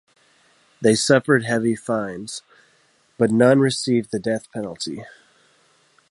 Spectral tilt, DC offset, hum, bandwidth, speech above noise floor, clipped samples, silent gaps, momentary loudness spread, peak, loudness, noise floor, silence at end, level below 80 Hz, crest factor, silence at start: -5 dB/octave; under 0.1%; none; 11.5 kHz; 41 dB; under 0.1%; none; 16 LU; -2 dBFS; -20 LUFS; -60 dBFS; 1 s; -62 dBFS; 20 dB; 0.8 s